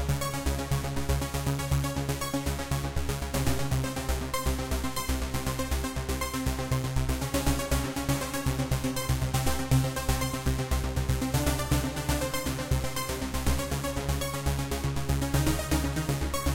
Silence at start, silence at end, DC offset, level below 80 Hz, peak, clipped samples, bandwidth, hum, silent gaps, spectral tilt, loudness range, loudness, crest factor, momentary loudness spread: 0 s; 0 s; 0.4%; -34 dBFS; -12 dBFS; under 0.1%; 17 kHz; none; none; -5 dB/octave; 2 LU; -30 LUFS; 16 dB; 4 LU